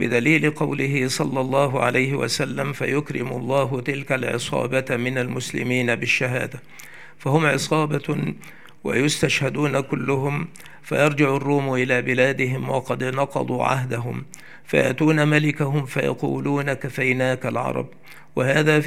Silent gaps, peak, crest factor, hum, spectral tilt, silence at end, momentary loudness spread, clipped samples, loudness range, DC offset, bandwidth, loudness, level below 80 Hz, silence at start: none; -2 dBFS; 20 dB; none; -5.5 dB/octave; 0 s; 10 LU; under 0.1%; 2 LU; 0.7%; 15.5 kHz; -22 LUFS; -62 dBFS; 0 s